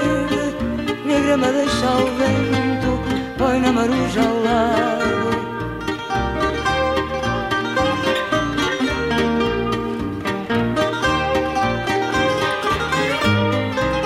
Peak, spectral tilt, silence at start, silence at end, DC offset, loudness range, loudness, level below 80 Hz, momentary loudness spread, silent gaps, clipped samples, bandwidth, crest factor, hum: -4 dBFS; -5.5 dB/octave; 0 s; 0 s; under 0.1%; 2 LU; -19 LUFS; -36 dBFS; 6 LU; none; under 0.1%; 15.5 kHz; 16 dB; none